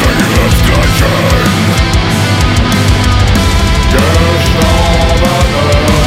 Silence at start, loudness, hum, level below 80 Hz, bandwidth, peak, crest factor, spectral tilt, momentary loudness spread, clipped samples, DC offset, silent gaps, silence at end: 0 s; -9 LUFS; none; -14 dBFS; 16.5 kHz; 0 dBFS; 8 dB; -5 dB/octave; 1 LU; under 0.1%; under 0.1%; none; 0 s